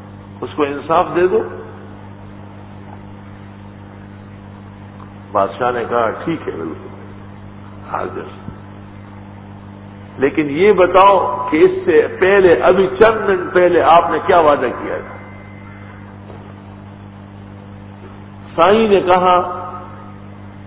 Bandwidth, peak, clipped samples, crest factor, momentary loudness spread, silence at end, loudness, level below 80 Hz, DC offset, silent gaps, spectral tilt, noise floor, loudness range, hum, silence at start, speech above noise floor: 4 kHz; 0 dBFS; under 0.1%; 16 dB; 25 LU; 0 s; -14 LUFS; -44 dBFS; under 0.1%; none; -10 dB/octave; -35 dBFS; 20 LU; 50 Hz at -35 dBFS; 0 s; 22 dB